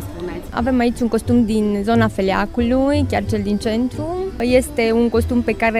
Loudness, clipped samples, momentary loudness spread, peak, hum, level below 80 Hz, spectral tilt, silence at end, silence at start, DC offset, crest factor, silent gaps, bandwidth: -18 LUFS; under 0.1%; 6 LU; -2 dBFS; none; -34 dBFS; -6.5 dB/octave; 0 s; 0 s; under 0.1%; 16 dB; none; 15 kHz